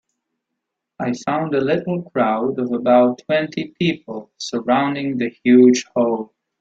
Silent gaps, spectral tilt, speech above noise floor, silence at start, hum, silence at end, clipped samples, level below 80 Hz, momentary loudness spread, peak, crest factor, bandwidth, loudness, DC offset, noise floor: none; -6 dB/octave; 62 dB; 1 s; none; 0.35 s; under 0.1%; -62 dBFS; 13 LU; -2 dBFS; 16 dB; 7.8 kHz; -18 LUFS; under 0.1%; -80 dBFS